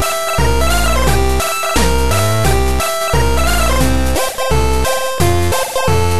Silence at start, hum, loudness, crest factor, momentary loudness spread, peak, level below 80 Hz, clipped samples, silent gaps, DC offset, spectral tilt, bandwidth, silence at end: 0 s; none; -14 LUFS; 12 dB; 2 LU; 0 dBFS; -18 dBFS; under 0.1%; none; 10%; -4 dB/octave; 14 kHz; 0 s